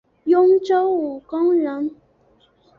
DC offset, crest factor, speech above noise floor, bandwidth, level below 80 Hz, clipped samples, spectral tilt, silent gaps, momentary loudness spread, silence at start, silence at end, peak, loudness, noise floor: under 0.1%; 14 dB; 40 dB; 6.6 kHz; -64 dBFS; under 0.1%; -6.5 dB/octave; none; 12 LU; 0.25 s; 0.85 s; -6 dBFS; -19 LUFS; -58 dBFS